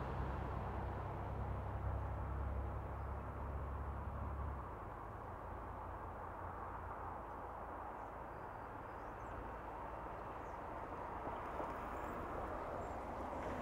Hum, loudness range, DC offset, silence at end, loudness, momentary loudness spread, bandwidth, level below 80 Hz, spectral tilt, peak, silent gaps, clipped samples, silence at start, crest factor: none; 4 LU; under 0.1%; 0 s; -47 LUFS; 6 LU; 16 kHz; -50 dBFS; -8 dB/octave; -30 dBFS; none; under 0.1%; 0 s; 14 dB